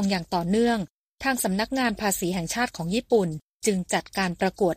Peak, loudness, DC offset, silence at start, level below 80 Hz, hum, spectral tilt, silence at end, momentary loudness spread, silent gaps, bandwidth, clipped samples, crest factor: -10 dBFS; -26 LUFS; under 0.1%; 0 s; -52 dBFS; none; -4.5 dB/octave; 0 s; 6 LU; 0.90-1.15 s, 3.43-3.60 s; 15.5 kHz; under 0.1%; 16 dB